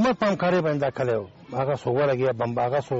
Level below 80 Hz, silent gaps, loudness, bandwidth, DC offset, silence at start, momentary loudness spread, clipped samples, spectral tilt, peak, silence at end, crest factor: -58 dBFS; none; -24 LUFS; 8 kHz; under 0.1%; 0 s; 6 LU; under 0.1%; -5.5 dB/octave; -12 dBFS; 0 s; 12 dB